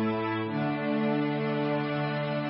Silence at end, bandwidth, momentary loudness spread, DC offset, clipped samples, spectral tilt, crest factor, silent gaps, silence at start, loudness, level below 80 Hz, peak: 0 s; 5.6 kHz; 2 LU; under 0.1%; under 0.1%; -11 dB/octave; 12 dB; none; 0 s; -29 LUFS; -70 dBFS; -16 dBFS